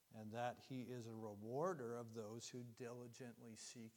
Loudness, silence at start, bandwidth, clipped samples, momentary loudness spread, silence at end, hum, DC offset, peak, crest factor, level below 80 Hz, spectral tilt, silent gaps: -51 LUFS; 0.1 s; 19 kHz; under 0.1%; 11 LU; 0 s; none; under 0.1%; -32 dBFS; 20 dB; under -90 dBFS; -5.5 dB/octave; none